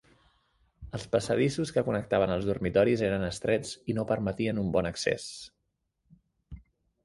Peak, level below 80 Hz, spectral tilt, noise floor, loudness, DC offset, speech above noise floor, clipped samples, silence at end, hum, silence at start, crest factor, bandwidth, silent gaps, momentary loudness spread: -12 dBFS; -52 dBFS; -6 dB/octave; -80 dBFS; -29 LUFS; under 0.1%; 51 dB; under 0.1%; 0.45 s; none; 0.8 s; 18 dB; 11.5 kHz; none; 11 LU